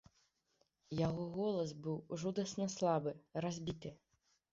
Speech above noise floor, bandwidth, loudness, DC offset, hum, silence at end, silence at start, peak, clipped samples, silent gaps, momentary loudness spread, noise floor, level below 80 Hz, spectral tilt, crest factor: 41 dB; 7.6 kHz; -40 LUFS; under 0.1%; none; 0.55 s; 0.9 s; -22 dBFS; under 0.1%; none; 9 LU; -80 dBFS; -68 dBFS; -6.5 dB/octave; 18 dB